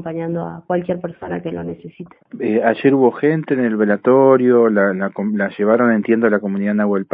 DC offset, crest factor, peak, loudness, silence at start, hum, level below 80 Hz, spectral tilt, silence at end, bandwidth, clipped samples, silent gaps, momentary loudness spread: under 0.1%; 16 dB; -2 dBFS; -16 LUFS; 0 s; none; -60 dBFS; -12 dB/octave; 0.1 s; 4.5 kHz; under 0.1%; none; 14 LU